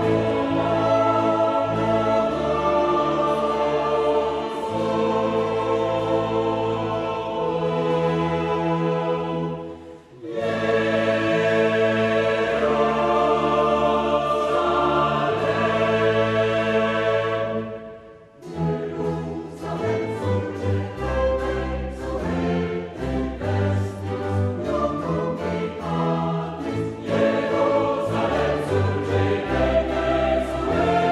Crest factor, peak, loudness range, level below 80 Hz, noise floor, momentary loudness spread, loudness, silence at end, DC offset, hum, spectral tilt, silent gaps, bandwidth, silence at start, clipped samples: 14 dB; -8 dBFS; 5 LU; -40 dBFS; -44 dBFS; 8 LU; -22 LUFS; 0 s; under 0.1%; none; -7 dB/octave; none; 11.5 kHz; 0 s; under 0.1%